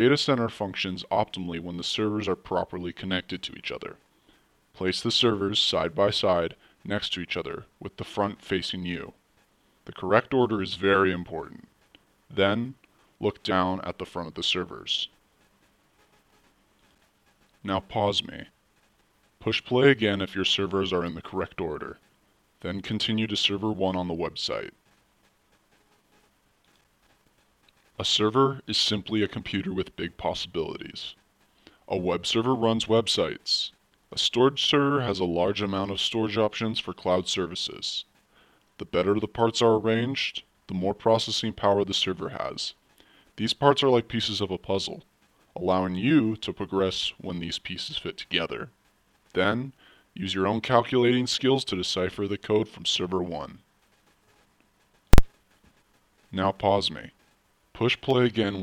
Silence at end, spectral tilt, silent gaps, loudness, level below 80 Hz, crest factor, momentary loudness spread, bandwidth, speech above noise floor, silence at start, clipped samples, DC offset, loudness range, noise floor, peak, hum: 0 s; -4.5 dB/octave; none; -26 LUFS; -42 dBFS; 28 dB; 13 LU; 17 kHz; 39 dB; 0 s; under 0.1%; under 0.1%; 7 LU; -66 dBFS; 0 dBFS; none